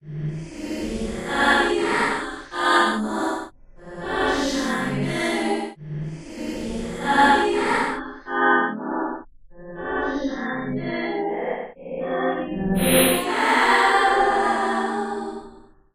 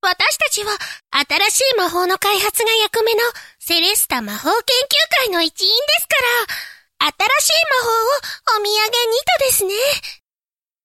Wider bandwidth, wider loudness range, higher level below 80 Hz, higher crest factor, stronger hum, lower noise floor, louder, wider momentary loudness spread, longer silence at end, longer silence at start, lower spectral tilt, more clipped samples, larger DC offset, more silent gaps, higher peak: about the same, 16 kHz vs 16.5 kHz; first, 6 LU vs 1 LU; first, -44 dBFS vs -56 dBFS; about the same, 18 dB vs 16 dB; neither; second, -46 dBFS vs under -90 dBFS; second, -22 LUFS vs -15 LUFS; first, 15 LU vs 7 LU; second, 0.35 s vs 0.7 s; about the same, 0.05 s vs 0.05 s; first, -4 dB/octave vs 0 dB/octave; neither; neither; neither; second, -4 dBFS vs 0 dBFS